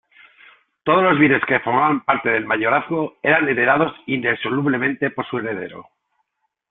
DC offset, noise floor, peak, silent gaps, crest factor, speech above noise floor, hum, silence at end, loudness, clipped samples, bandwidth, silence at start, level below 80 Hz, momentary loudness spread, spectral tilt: under 0.1%; -72 dBFS; -2 dBFS; none; 18 dB; 54 dB; none; 0.9 s; -18 LUFS; under 0.1%; 4.1 kHz; 0.85 s; -60 dBFS; 10 LU; -10.5 dB/octave